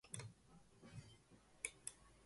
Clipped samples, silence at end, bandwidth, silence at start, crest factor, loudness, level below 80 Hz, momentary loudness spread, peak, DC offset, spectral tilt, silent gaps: under 0.1%; 0 s; 11.5 kHz; 0.05 s; 30 dB; -54 LUFS; -76 dBFS; 19 LU; -26 dBFS; under 0.1%; -2.5 dB/octave; none